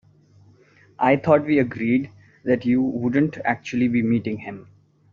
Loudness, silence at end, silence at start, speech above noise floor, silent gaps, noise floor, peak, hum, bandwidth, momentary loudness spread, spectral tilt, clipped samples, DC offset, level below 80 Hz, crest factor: -21 LUFS; 0.5 s; 1 s; 33 dB; none; -54 dBFS; -4 dBFS; none; 7 kHz; 14 LU; -6.5 dB/octave; under 0.1%; under 0.1%; -58 dBFS; 18 dB